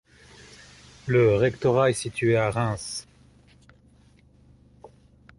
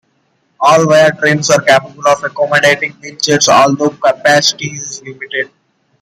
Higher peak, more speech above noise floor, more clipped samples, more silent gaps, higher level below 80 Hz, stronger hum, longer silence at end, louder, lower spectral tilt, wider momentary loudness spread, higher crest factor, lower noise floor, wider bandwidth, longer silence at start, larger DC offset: second, -8 dBFS vs 0 dBFS; second, 34 dB vs 48 dB; neither; neither; about the same, -54 dBFS vs -56 dBFS; neither; about the same, 0.5 s vs 0.55 s; second, -23 LUFS vs -11 LUFS; first, -6 dB/octave vs -3 dB/octave; about the same, 13 LU vs 13 LU; first, 18 dB vs 12 dB; about the same, -57 dBFS vs -59 dBFS; second, 11.5 kHz vs 16 kHz; first, 1.05 s vs 0.6 s; neither